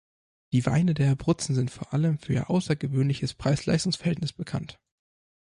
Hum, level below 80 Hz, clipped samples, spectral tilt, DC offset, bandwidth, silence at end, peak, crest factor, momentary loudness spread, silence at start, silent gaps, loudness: none; -52 dBFS; under 0.1%; -6.5 dB/octave; under 0.1%; 11.5 kHz; 0.7 s; -8 dBFS; 18 dB; 8 LU; 0.5 s; none; -27 LUFS